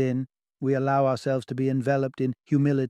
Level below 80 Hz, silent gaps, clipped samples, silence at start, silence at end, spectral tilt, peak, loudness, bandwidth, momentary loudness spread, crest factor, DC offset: -66 dBFS; none; under 0.1%; 0 s; 0 s; -8.5 dB/octave; -10 dBFS; -26 LUFS; 10.5 kHz; 8 LU; 14 dB; under 0.1%